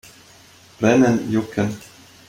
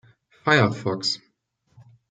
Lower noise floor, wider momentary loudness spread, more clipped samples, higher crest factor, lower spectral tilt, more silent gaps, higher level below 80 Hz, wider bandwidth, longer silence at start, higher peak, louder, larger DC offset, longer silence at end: second, -48 dBFS vs -69 dBFS; about the same, 10 LU vs 11 LU; neither; about the same, 18 dB vs 22 dB; first, -6.5 dB/octave vs -5 dB/octave; neither; first, -56 dBFS vs -64 dBFS; first, 16 kHz vs 9.4 kHz; first, 0.8 s vs 0.45 s; about the same, -4 dBFS vs -4 dBFS; first, -19 LUFS vs -22 LUFS; neither; second, 0.5 s vs 0.95 s